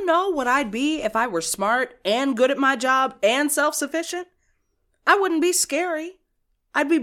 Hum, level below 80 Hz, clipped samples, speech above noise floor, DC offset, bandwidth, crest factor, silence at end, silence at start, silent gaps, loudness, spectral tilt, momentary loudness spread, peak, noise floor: none; -60 dBFS; under 0.1%; 49 dB; under 0.1%; 17.5 kHz; 18 dB; 0 s; 0 s; none; -21 LUFS; -2 dB/octave; 8 LU; -4 dBFS; -71 dBFS